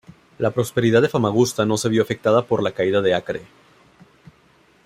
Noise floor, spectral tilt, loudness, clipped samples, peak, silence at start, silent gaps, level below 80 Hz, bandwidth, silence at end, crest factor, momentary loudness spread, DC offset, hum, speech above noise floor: -56 dBFS; -5.5 dB/octave; -20 LUFS; under 0.1%; -4 dBFS; 0.4 s; none; -58 dBFS; 16 kHz; 1.4 s; 18 dB; 7 LU; under 0.1%; none; 37 dB